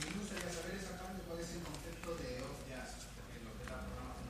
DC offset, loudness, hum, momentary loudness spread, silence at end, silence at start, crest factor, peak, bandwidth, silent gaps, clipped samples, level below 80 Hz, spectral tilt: under 0.1%; -46 LUFS; none; 7 LU; 0 s; 0 s; 20 dB; -26 dBFS; 15.5 kHz; none; under 0.1%; -54 dBFS; -4 dB/octave